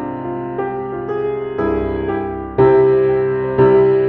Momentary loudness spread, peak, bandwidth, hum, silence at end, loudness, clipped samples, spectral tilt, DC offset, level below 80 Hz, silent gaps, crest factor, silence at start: 12 LU; -2 dBFS; 4.2 kHz; none; 0 s; -16 LUFS; under 0.1%; -7.5 dB/octave; under 0.1%; -38 dBFS; none; 14 dB; 0 s